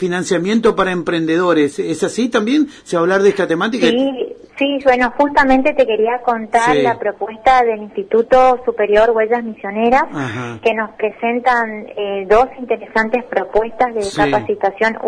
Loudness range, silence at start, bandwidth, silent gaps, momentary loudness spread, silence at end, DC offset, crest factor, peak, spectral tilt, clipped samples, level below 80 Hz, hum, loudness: 3 LU; 0 s; 11 kHz; none; 8 LU; 0 s; under 0.1%; 14 dB; 0 dBFS; -5 dB/octave; under 0.1%; -42 dBFS; none; -15 LUFS